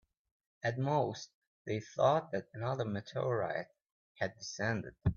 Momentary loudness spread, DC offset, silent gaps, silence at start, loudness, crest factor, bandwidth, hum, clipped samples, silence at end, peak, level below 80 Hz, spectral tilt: 11 LU; under 0.1%; 1.34-1.65 s, 3.92-4.15 s; 0.65 s; -36 LUFS; 20 dB; 7.2 kHz; none; under 0.1%; 0 s; -16 dBFS; -60 dBFS; -5.5 dB/octave